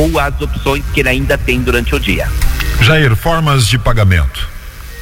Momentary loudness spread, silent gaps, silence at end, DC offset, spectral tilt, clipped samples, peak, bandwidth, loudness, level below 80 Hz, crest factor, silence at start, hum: 8 LU; none; 0 s; under 0.1%; -5 dB/octave; under 0.1%; 0 dBFS; 17 kHz; -12 LUFS; -18 dBFS; 12 dB; 0 s; none